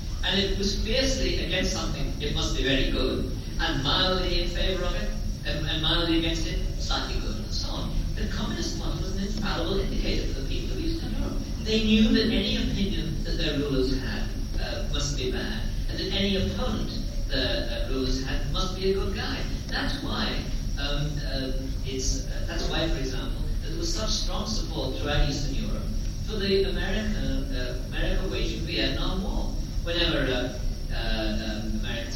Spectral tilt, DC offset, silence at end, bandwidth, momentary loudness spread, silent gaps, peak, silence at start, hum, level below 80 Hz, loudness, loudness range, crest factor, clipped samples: -4.5 dB/octave; under 0.1%; 0 s; 16 kHz; 8 LU; none; -10 dBFS; 0 s; none; -30 dBFS; -28 LUFS; 4 LU; 16 dB; under 0.1%